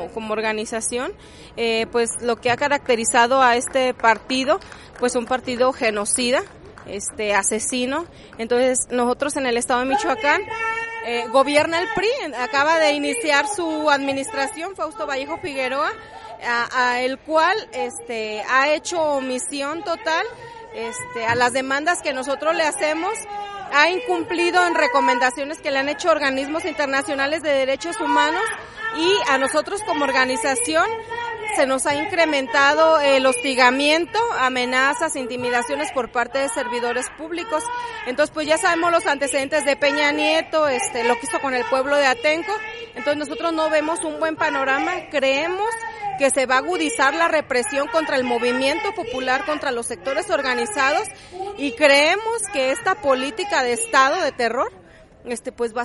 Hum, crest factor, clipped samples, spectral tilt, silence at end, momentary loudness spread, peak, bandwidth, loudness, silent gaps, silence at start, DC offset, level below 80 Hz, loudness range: none; 20 dB; under 0.1%; -2 dB/octave; 0 s; 10 LU; 0 dBFS; 11.5 kHz; -20 LUFS; none; 0 s; under 0.1%; -54 dBFS; 4 LU